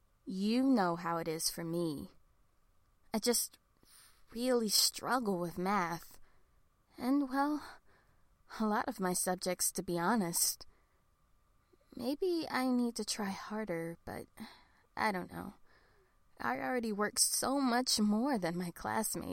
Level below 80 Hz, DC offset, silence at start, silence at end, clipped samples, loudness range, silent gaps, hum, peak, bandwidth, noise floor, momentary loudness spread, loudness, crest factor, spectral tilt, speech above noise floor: -66 dBFS; under 0.1%; 0.25 s; 0 s; under 0.1%; 5 LU; none; none; -14 dBFS; 16.5 kHz; -71 dBFS; 16 LU; -34 LUFS; 22 dB; -3 dB/octave; 37 dB